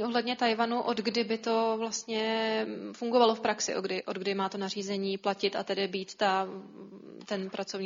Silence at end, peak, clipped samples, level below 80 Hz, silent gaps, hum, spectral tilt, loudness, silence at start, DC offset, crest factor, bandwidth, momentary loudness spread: 0 s; -12 dBFS; under 0.1%; -80 dBFS; none; none; -3.5 dB/octave; -30 LUFS; 0 s; under 0.1%; 20 dB; 7.6 kHz; 10 LU